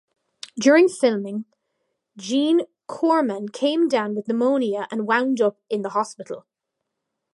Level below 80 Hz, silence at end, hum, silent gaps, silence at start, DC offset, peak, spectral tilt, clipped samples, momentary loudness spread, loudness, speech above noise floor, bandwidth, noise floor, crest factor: -78 dBFS; 0.95 s; none; none; 0.55 s; under 0.1%; -4 dBFS; -4.5 dB/octave; under 0.1%; 18 LU; -21 LUFS; 60 dB; 11.5 kHz; -81 dBFS; 18 dB